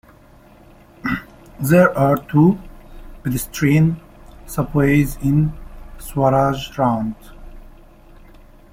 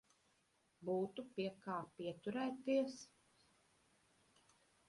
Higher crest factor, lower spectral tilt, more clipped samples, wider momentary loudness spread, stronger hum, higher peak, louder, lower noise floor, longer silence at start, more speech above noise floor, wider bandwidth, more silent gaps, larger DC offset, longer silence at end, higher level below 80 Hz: about the same, 18 dB vs 20 dB; about the same, -7 dB/octave vs -6 dB/octave; neither; first, 14 LU vs 11 LU; neither; first, -2 dBFS vs -28 dBFS; first, -18 LUFS vs -44 LUFS; second, -47 dBFS vs -79 dBFS; first, 1.05 s vs 0.8 s; second, 30 dB vs 36 dB; first, 16.5 kHz vs 11.5 kHz; neither; neither; second, 1.05 s vs 1.8 s; first, -38 dBFS vs -84 dBFS